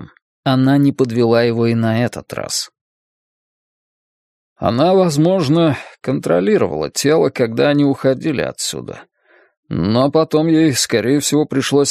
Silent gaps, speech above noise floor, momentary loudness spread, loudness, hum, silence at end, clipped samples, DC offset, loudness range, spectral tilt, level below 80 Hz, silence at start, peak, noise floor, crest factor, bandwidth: 0.22-0.43 s, 2.81-4.56 s, 9.57-9.63 s; over 75 dB; 9 LU; -16 LUFS; none; 0 s; under 0.1%; under 0.1%; 5 LU; -5.5 dB/octave; -52 dBFS; 0 s; 0 dBFS; under -90 dBFS; 16 dB; 15.5 kHz